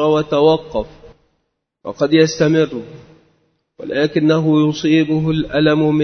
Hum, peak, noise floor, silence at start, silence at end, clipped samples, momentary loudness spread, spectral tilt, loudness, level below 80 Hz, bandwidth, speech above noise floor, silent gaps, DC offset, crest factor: none; 0 dBFS; -70 dBFS; 0 s; 0 s; under 0.1%; 15 LU; -6.5 dB/octave; -15 LUFS; -46 dBFS; 6.6 kHz; 55 dB; none; under 0.1%; 16 dB